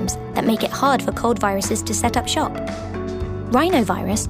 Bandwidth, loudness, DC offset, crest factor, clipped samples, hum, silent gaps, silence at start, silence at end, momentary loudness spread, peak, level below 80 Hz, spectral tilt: 16 kHz; -20 LUFS; under 0.1%; 16 dB; under 0.1%; none; none; 0 s; 0 s; 10 LU; -4 dBFS; -38 dBFS; -4.5 dB/octave